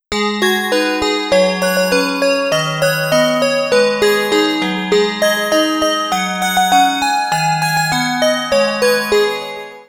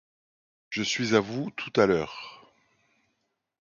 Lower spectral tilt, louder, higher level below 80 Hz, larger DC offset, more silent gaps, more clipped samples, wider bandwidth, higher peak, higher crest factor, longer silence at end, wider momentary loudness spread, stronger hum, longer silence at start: about the same, -3.5 dB/octave vs -4.5 dB/octave; first, -14 LUFS vs -27 LUFS; first, -48 dBFS vs -62 dBFS; neither; neither; neither; first, over 20 kHz vs 7.4 kHz; first, 0 dBFS vs -8 dBFS; second, 14 dB vs 22 dB; second, 0.05 s vs 1.25 s; second, 3 LU vs 14 LU; neither; second, 0.1 s vs 0.7 s